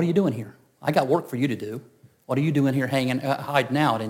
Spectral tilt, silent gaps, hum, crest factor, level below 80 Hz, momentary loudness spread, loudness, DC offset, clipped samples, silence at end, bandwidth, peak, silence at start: -7 dB/octave; none; none; 18 dB; -70 dBFS; 12 LU; -24 LUFS; under 0.1%; under 0.1%; 0 s; 17 kHz; -6 dBFS; 0 s